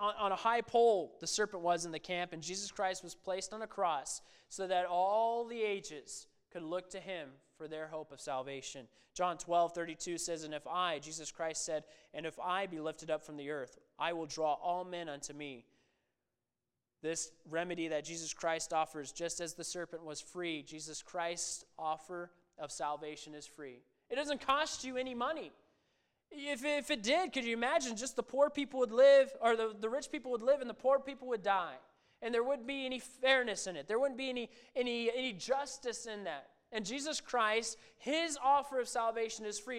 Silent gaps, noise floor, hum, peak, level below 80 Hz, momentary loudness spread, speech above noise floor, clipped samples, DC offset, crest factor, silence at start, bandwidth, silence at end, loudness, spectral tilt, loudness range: none; under -90 dBFS; none; -14 dBFS; -72 dBFS; 13 LU; over 53 dB; under 0.1%; under 0.1%; 22 dB; 0 s; 14.5 kHz; 0 s; -36 LUFS; -2.5 dB/octave; 10 LU